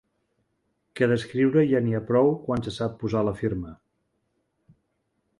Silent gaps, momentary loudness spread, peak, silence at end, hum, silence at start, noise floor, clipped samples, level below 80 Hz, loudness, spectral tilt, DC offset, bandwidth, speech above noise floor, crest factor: none; 9 LU; -8 dBFS; 1.65 s; none; 0.95 s; -75 dBFS; under 0.1%; -54 dBFS; -24 LUFS; -8 dB/octave; under 0.1%; 11.5 kHz; 51 dB; 18 dB